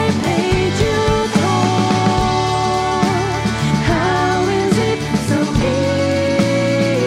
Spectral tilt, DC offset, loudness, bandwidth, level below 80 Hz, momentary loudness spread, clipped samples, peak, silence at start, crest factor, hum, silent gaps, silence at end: -5.5 dB/octave; under 0.1%; -16 LUFS; 15 kHz; -32 dBFS; 2 LU; under 0.1%; -4 dBFS; 0 s; 12 dB; none; none; 0 s